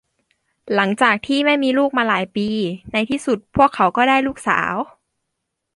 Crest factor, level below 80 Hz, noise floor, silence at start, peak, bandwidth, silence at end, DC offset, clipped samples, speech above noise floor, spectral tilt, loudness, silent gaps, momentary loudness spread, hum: 18 dB; -52 dBFS; -77 dBFS; 0.65 s; -2 dBFS; 11.5 kHz; 0.9 s; under 0.1%; under 0.1%; 59 dB; -5 dB/octave; -18 LUFS; none; 7 LU; none